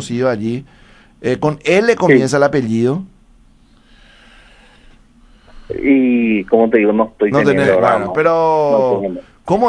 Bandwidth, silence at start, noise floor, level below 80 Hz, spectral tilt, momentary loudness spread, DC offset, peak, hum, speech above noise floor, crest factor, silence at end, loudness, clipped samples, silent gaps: 10.5 kHz; 0 s; -48 dBFS; -46 dBFS; -6.5 dB/octave; 10 LU; under 0.1%; 0 dBFS; none; 35 dB; 16 dB; 0 s; -14 LUFS; under 0.1%; none